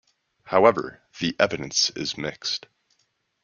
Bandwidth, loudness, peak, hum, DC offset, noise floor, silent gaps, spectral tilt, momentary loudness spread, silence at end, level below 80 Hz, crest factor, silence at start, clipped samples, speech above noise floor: 7.2 kHz; -23 LUFS; -2 dBFS; none; under 0.1%; -71 dBFS; none; -3 dB/octave; 12 LU; 0.85 s; -62 dBFS; 22 dB; 0.45 s; under 0.1%; 47 dB